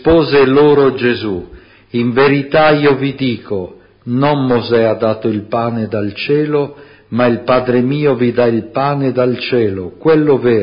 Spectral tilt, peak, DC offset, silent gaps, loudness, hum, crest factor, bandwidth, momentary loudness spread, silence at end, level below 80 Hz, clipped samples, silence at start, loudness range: -12 dB/octave; 0 dBFS; under 0.1%; none; -13 LUFS; none; 12 dB; 5.4 kHz; 11 LU; 0 s; -42 dBFS; under 0.1%; 0 s; 3 LU